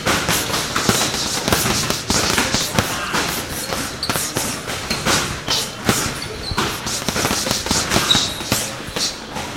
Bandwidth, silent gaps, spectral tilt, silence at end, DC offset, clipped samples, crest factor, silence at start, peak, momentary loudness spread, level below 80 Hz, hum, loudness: 17 kHz; none; -2.5 dB/octave; 0 s; 0.2%; under 0.1%; 20 dB; 0 s; 0 dBFS; 7 LU; -38 dBFS; none; -19 LUFS